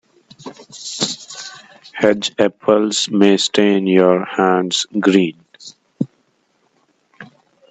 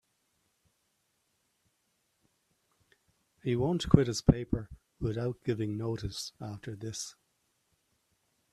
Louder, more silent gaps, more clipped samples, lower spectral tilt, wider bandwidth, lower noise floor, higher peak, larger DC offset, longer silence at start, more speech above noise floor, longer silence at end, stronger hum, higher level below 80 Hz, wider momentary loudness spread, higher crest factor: first, -16 LUFS vs -32 LUFS; neither; neither; second, -4 dB/octave vs -6.5 dB/octave; second, 9.2 kHz vs 14 kHz; second, -62 dBFS vs -77 dBFS; first, 0 dBFS vs -4 dBFS; neither; second, 0.4 s vs 3.45 s; about the same, 48 dB vs 46 dB; second, 0.45 s vs 1.4 s; neither; second, -62 dBFS vs -50 dBFS; first, 21 LU vs 16 LU; second, 18 dB vs 30 dB